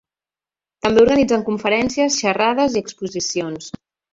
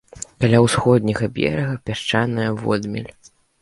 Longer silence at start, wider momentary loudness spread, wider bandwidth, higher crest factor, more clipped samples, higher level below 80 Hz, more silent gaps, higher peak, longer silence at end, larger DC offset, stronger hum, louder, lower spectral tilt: first, 0.85 s vs 0.15 s; about the same, 14 LU vs 14 LU; second, 7.8 kHz vs 11.5 kHz; about the same, 18 dB vs 20 dB; neither; about the same, -50 dBFS vs -46 dBFS; neither; about the same, -2 dBFS vs 0 dBFS; about the same, 0.45 s vs 0.55 s; neither; neither; about the same, -18 LUFS vs -19 LUFS; second, -3.5 dB/octave vs -6 dB/octave